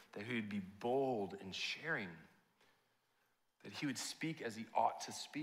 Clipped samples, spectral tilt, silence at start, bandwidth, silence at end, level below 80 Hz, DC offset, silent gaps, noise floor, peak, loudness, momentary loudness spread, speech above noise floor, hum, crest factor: under 0.1%; -4 dB/octave; 0 s; 16 kHz; 0 s; -88 dBFS; under 0.1%; none; -80 dBFS; -20 dBFS; -42 LUFS; 9 LU; 38 dB; none; 24 dB